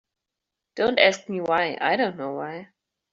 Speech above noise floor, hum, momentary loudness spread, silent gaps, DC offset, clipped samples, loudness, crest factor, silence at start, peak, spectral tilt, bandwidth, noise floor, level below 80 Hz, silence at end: 62 dB; none; 16 LU; none; under 0.1%; under 0.1%; -23 LUFS; 22 dB; 0.75 s; -2 dBFS; -1.5 dB/octave; 7.6 kHz; -85 dBFS; -66 dBFS; 0.5 s